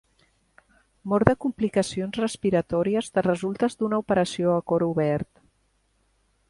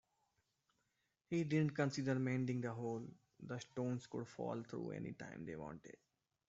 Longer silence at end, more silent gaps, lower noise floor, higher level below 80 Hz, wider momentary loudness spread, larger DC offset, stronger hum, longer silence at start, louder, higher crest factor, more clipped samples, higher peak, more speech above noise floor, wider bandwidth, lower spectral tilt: first, 1.25 s vs 0.55 s; neither; second, -68 dBFS vs -86 dBFS; first, -52 dBFS vs -78 dBFS; second, 6 LU vs 13 LU; neither; neither; second, 1.05 s vs 1.3 s; first, -25 LUFS vs -43 LUFS; first, 26 dB vs 18 dB; neither; first, 0 dBFS vs -26 dBFS; about the same, 44 dB vs 43 dB; first, 11.5 kHz vs 8 kHz; about the same, -6.5 dB/octave vs -7 dB/octave